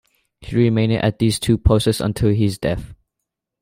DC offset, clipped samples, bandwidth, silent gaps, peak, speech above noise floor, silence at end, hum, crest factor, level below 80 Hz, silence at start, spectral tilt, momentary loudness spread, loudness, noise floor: under 0.1%; under 0.1%; 16 kHz; none; -2 dBFS; 63 dB; 0.7 s; none; 16 dB; -32 dBFS; 0.4 s; -6.5 dB/octave; 8 LU; -18 LUFS; -81 dBFS